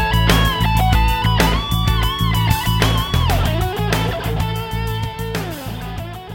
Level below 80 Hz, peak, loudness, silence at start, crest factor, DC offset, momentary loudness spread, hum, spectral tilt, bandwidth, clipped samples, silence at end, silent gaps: -22 dBFS; 0 dBFS; -18 LUFS; 0 s; 18 dB; under 0.1%; 10 LU; none; -5 dB/octave; 17 kHz; under 0.1%; 0 s; none